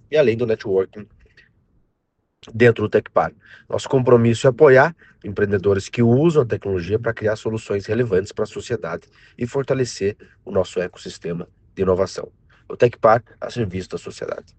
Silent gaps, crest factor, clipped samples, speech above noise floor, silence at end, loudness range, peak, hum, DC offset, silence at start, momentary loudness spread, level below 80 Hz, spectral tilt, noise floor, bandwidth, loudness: none; 20 dB; under 0.1%; 52 dB; 0.15 s; 8 LU; 0 dBFS; none; under 0.1%; 0.1 s; 16 LU; -52 dBFS; -6.5 dB/octave; -71 dBFS; 8.8 kHz; -20 LUFS